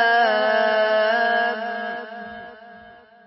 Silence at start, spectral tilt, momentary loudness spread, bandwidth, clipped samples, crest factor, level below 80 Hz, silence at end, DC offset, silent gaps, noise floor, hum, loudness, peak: 0 s; -6.5 dB/octave; 18 LU; 5.8 kHz; under 0.1%; 14 dB; -70 dBFS; 0.35 s; under 0.1%; none; -46 dBFS; none; -20 LUFS; -6 dBFS